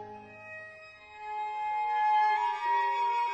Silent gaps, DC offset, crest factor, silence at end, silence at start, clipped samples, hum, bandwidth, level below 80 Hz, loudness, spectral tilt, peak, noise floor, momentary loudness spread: none; under 0.1%; 12 dB; 0 s; 0 s; under 0.1%; none; 8.2 kHz; -74 dBFS; -29 LUFS; -2.5 dB/octave; -18 dBFS; -50 dBFS; 20 LU